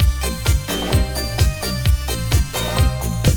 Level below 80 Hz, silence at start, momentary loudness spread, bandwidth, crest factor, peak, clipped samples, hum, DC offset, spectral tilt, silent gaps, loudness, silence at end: -20 dBFS; 0 s; 2 LU; over 20 kHz; 14 dB; -4 dBFS; under 0.1%; none; under 0.1%; -4.5 dB/octave; none; -20 LUFS; 0 s